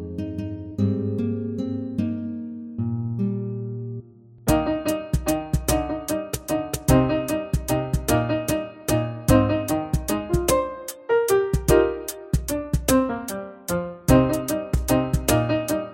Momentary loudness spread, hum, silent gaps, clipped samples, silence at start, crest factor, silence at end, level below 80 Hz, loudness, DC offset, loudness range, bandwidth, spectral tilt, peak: 11 LU; none; none; under 0.1%; 0 s; 20 dB; 0 s; -34 dBFS; -24 LUFS; under 0.1%; 5 LU; 17 kHz; -6 dB/octave; -4 dBFS